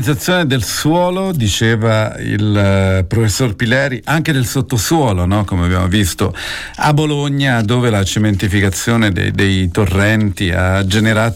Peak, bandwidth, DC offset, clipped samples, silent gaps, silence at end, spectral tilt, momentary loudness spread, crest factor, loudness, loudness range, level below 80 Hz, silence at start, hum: -4 dBFS; 16.5 kHz; under 0.1%; under 0.1%; none; 0 s; -5 dB/octave; 3 LU; 10 dB; -14 LUFS; 1 LU; -34 dBFS; 0 s; none